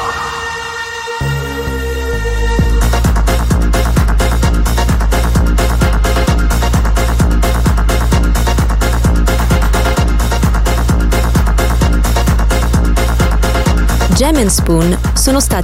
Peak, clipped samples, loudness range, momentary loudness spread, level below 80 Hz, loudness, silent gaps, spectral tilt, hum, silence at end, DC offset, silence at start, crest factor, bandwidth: 0 dBFS; under 0.1%; 2 LU; 6 LU; -12 dBFS; -13 LUFS; none; -5 dB/octave; none; 0 s; 0.4%; 0 s; 10 dB; 16.5 kHz